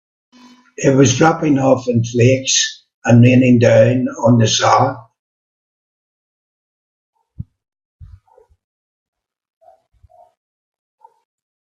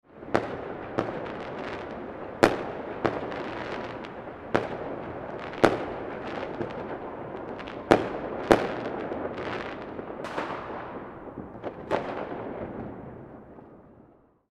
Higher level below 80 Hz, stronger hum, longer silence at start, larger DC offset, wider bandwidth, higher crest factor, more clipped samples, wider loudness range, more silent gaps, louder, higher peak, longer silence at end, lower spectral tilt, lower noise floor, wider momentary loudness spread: about the same, -52 dBFS vs -54 dBFS; neither; first, 0.8 s vs 0.1 s; neither; second, 7.8 kHz vs 14.5 kHz; second, 16 dB vs 30 dB; neither; about the same, 7 LU vs 7 LU; first, 2.94-3.02 s, 5.19-7.13 s, 7.85-7.99 s vs none; first, -13 LUFS vs -31 LUFS; about the same, 0 dBFS vs -2 dBFS; first, 3.75 s vs 0.4 s; about the same, -5 dB/octave vs -6 dB/octave; second, -50 dBFS vs -58 dBFS; second, 8 LU vs 16 LU